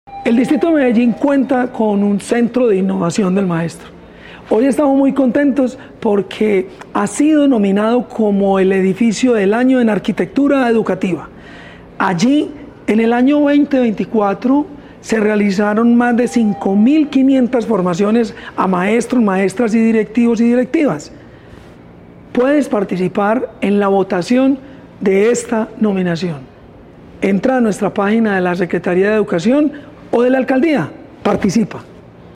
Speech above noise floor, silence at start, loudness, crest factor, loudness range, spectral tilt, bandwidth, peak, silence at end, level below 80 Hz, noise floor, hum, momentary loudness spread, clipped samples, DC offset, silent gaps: 26 dB; 0.1 s; -14 LUFS; 12 dB; 3 LU; -6.5 dB/octave; 11.5 kHz; -2 dBFS; 0.4 s; -48 dBFS; -39 dBFS; none; 8 LU; under 0.1%; under 0.1%; none